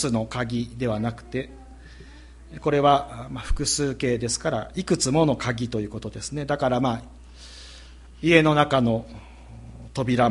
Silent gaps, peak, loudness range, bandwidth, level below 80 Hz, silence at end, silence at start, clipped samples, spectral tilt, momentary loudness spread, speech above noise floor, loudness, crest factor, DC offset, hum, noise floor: none; -2 dBFS; 3 LU; 11.5 kHz; -40 dBFS; 0 s; 0 s; under 0.1%; -5 dB/octave; 23 LU; 22 dB; -24 LUFS; 22 dB; under 0.1%; none; -45 dBFS